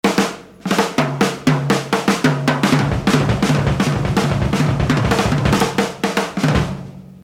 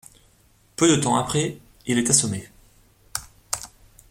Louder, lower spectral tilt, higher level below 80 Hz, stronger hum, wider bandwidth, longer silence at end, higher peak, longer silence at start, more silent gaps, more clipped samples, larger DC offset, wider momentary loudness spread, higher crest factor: first, -17 LUFS vs -22 LUFS; first, -5.5 dB/octave vs -3.5 dB/octave; first, -32 dBFS vs -54 dBFS; neither; about the same, 17 kHz vs 16.5 kHz; second, 0.1 s vs 0.45 s; about the same, -2 dBFS vs -2 dBFS; second, 0.05 s vs 0.8 s; neither; neither; neither; second, 4 LU vs 16 LU; second, 16 dB vs 22 dB